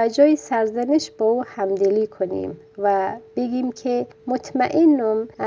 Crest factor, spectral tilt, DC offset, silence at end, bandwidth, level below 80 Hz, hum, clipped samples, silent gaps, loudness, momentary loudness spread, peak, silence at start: 16 dB; -5.5 dB/octave; under 0.1%; 0 s; 7.6 kHz; -64 dBFS; none; under 0.1%; none; -21 LUFS; 10 LU; -4 dBFS; 0 s